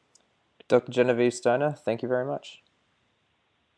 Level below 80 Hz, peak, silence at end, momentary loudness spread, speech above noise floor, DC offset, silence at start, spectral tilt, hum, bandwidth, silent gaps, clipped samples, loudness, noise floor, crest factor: -78 dBFS; -8 dBFS; 1.25 s; 11 LU; 46 dB; under 0.1%; 0.7 s; -6 dB/octave; none; 10.5 kHz; none; under 0.1%; -26 LUFS; -71 dBFS; 22 dB